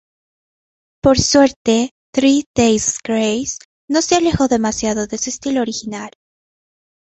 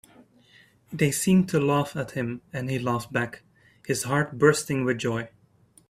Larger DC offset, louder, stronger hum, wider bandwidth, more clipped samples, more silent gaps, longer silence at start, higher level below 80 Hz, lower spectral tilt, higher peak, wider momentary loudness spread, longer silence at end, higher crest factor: neither; first, -16 LUFS vs -25 LUFS; neither; second, 8.2 kHz vs 15.5 kHz; neither; first, 1.56-1.65 s, 1.91-2.13 s, 2.46-2.54 s, 3.65-3.88 s vs none; first, 1.05 s vs 0.9 s; first, -40 dBFS vs -60 dBFS; second, -4 dB/octave vs -5.5 dB/octave; first, 0 dBFS vs -4 dBFS; about the same, 11 LU vs 12 LU; first, 1 s vs 0.6 s; second, 18 dB vs 24 dB